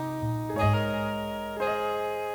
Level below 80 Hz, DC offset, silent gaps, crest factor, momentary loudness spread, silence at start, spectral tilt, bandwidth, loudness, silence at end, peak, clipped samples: -50 dBFS; under 0.1%; none; 16 dB; 6 LU; 0 s; -7 dB/octave; over 20 kHz; -29 LUFS; 0 s; -12 dBFS; under 0.1%